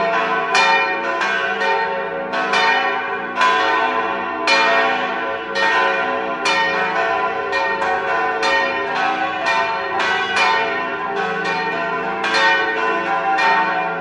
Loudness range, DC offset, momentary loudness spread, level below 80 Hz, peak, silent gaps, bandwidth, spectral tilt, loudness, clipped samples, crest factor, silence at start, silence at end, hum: 2 LU; under 0.1%; 7 LU; -58 dBFS; -2 dBFS; none; 11.5 kHz; -2.5 dB/octave; -17 LUFS; under 0.1%; 16 dB; 0 s; 0 s; none